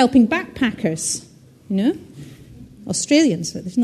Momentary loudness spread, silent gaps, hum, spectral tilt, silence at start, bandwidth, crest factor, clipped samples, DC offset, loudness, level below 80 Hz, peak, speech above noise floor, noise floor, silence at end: 22 LU; none; none; -4 dB/octave; 0 s; 13 kHz; 18 dB; under 0.1%; under 0.1%; -20 LUFS; -52 dBFS; -2 dBFS; 23 dB; -41 dBFS; 0 s